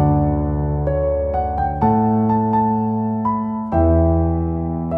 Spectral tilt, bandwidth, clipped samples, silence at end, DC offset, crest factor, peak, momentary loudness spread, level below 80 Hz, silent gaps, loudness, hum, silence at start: -13 dB/octave; 3.1 kHz; under 0.1%; 0 s; under 0.1%; 14 dB; -4 dBFS; 5 LU; -28 dBFS; none; -19 LUFS; none; 0 s